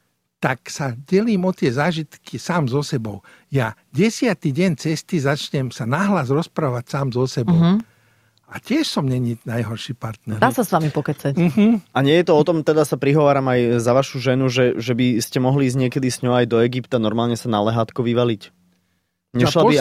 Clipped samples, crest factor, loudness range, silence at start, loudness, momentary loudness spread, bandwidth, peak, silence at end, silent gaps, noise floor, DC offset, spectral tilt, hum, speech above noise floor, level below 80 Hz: under 0.1%; 16 dB; 5 LU; 0.4 s; -19 LUFS; 9 LU; 15.5 kHz; -2 dBFS; 0 s; none; -69 dBFS; under 0.1%; -6.5 dB/octave; none; 51 dB; -54 dBFS